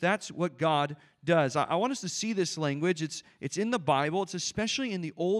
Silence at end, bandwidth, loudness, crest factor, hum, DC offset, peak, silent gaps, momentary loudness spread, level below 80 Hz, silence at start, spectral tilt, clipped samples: 0 s; 12.5 kHz; -30 LUFS; 18 dB; none; under 0.1%; -10 dBFS; none; 7 LU; -70 dBFS; 0 s; -4.5 dB/octave; under 0.1%